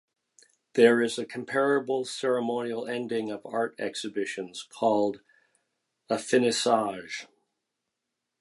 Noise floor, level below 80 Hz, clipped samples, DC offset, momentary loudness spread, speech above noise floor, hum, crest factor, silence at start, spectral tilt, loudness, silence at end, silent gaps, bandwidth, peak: -84 dBFS; -78 dBFS; under 0.1%; under 0.1%; 12 LU; 57 dB; none; 22 dB; 0.75 s; -4 dB/octave; -27 LUFS; 1.15 s; none; 11.5 kHz; -6 dBFS